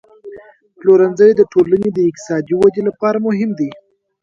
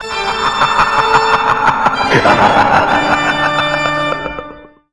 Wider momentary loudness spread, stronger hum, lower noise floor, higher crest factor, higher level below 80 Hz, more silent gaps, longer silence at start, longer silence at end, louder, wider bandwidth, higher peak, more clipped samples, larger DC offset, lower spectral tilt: about the same, 9 LU vs 8 LU; neither; first, -40 dBFS vs -34 dBFS; about the same, 14 dB vs 12 dB; second, -54 dBFS vs -38 dBFS; neither; first, 0.25 s vs 0 s; first, 0.5 s vs 0.25 s; about the same, -14 LUFS vs -12 LUFS; second, 7.6 kHz vs 11 kHz; about the same, 0 dBFS vs 0 dBFS; neither; second, under 0.1% vs 0.9%; first, -7.5 dB/octave vs -4 dB/octave